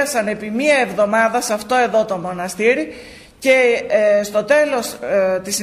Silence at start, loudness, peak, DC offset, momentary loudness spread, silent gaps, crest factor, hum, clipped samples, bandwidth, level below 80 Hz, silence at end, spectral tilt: 0 s; -17 LUFS; -4 dBFS; under 0.1%; 8 LU; none; 14 dB; none; under 0.1%; 15.5 kHz; -54 dBFS; 0 s; -3.5 dB/octave